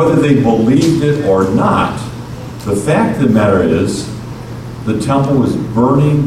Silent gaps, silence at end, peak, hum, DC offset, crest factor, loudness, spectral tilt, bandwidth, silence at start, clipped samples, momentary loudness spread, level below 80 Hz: none; 0 s; 0 dBFS; none; under 0.1%; 12 dB; -13 LUFS; -7 dB/octave; 14.5 kHz; 0 s; under 0.1%; 15 LU; -36 dBFS